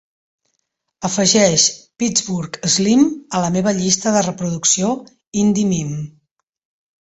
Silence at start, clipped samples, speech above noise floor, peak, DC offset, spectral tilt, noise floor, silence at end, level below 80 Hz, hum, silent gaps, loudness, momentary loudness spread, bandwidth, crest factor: 1 s; under 0.1%; 56 dB; 0 dBFS; under 0.1%; -3.5 dB/octave; -73 dBFS; 0.9 s; -54 dBFS; none; 5.27-5.32 s; -16 LUFS; 13 LU; 8.2 kHz; 18 dB